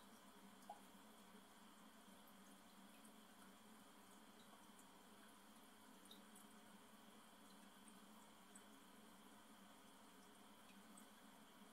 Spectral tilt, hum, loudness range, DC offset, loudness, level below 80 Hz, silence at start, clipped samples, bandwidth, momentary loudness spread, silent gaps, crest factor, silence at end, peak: -3 dB/octave; none; 1 LU; under 0.1%; -65 LUFS; under -90 dBFS; 0 s; under 0.1%; 16 kHz; 2 LU; none; 22 dB; 0 s; -44 dBFS